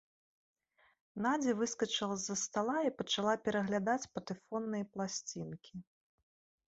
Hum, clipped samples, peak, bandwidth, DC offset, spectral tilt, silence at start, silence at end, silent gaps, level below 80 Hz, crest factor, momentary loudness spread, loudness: none; under 0.1%; -18 dBFS; 8 kHz; under 0.1%; -3.5 dB/octave; 1.15 s; 0.85 s; none; -76 dBFS; 20 dB; 12 LU; -36 LUFS